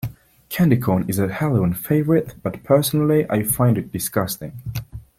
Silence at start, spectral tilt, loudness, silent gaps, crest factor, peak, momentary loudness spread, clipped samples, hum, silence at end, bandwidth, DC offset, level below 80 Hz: 0.05 s; -6.5 dB/octave; -20 LUFS; none; 16 dB; -4 dBFS; 13 LU; under 0.1%; none; 0.15 s; 16.5 kHz; under 0.1%; -48 dBFS